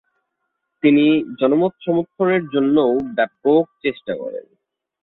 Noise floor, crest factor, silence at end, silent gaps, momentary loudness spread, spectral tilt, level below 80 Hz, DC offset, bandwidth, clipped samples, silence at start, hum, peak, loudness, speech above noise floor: -75 dBFS; 16 dB; 0.6 s; none; 12 LU; -10 dB/octave; -62 dBFS; under 0.1%; 4.1 kHz; under 0.1%; 0.85 s; none; -4 dBFS; -18 LUFS; 58 dB